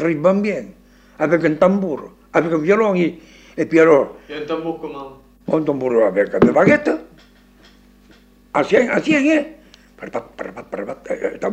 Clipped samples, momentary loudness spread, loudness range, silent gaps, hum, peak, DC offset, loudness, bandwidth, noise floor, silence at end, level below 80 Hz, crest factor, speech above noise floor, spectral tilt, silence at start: under 0.1%; 17 LU; 4 LU; none; none; -2 dBFS; under 0.1%; -17 LUFS; 8.8 kHz; -49 dBFS; 0 s; -52 dBFS; 18 dB; 32 dB; -7 dB/octave; 0 s